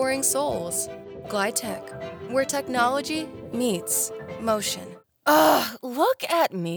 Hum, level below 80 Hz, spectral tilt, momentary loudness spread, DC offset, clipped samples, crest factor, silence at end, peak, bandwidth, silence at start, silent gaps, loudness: none; -62 dBFS; -3 dB/octave; 13 LU; under 0.1%; under 0.1%; 18 dB; 0 s; -8 dBFS; over 20 kHz; 0 s; none; -24 LUFS